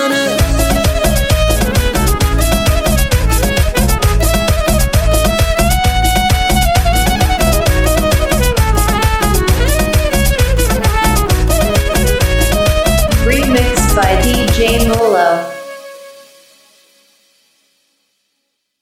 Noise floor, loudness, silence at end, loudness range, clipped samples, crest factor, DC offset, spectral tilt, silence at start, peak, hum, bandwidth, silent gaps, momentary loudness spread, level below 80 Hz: -69 dBFS; -12 LUFS; 2.7 s; 2 LU; under 0.1%; 12 dB; 0.3%; -4.5 dB/octave; 0 s; 0 dBFS; none; 16 kHz; none; 2 LU; -16 dBFS